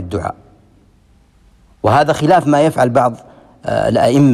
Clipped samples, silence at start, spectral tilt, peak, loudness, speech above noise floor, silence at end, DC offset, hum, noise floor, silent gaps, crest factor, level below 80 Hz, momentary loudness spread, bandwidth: under 0.1%; 0 s; -7 dB/octave; -2 dBFS; -14 LUFS; 38 dB; 0 s; under 0.1%; none; -50 dBFS; none; 12 dB; -46 dBFS; 13 LU; 13 kHz